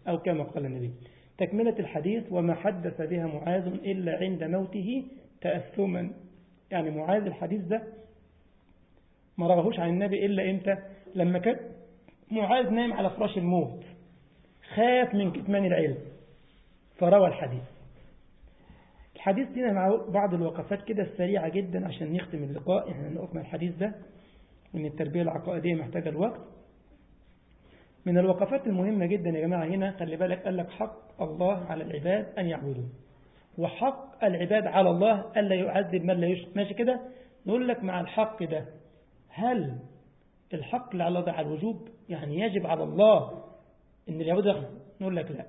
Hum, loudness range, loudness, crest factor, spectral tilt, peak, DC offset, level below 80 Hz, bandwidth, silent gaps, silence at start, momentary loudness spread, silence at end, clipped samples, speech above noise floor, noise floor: none; 6 LU; -29 LUFS; 20 dB; -11 dB/octave; -8 dBFS; under 0.1%; -62 dBFS; 4 kHz; none; 0.05 s; 12 LU; 0 s; under 0.1%; 34 dB; -62 dBFS